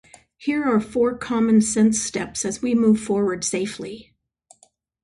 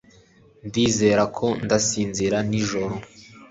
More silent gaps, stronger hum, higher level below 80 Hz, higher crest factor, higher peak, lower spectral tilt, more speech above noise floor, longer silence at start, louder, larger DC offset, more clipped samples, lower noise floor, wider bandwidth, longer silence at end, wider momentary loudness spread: neither; neither; about the same, -54 dBFS vs -50 dBFS; about the same, 14 dB vs 18 dB; about the same, -6 dBFS vs -6 dBFS; about the same, -4.5 dB/octave vs -4.5 dB/octave; first, 39 dB vs 32 dB; second, 0.4 s vs 0.65 s; about the same, -21 LUFS vs -22 LUFS; neither; neither; first, -60 dBFS vs -53 dBFS; first, 11.5 kHz vs 8 kHz; first, 1 s vs 0.05 s; about the same, 12 LU vs 11 LU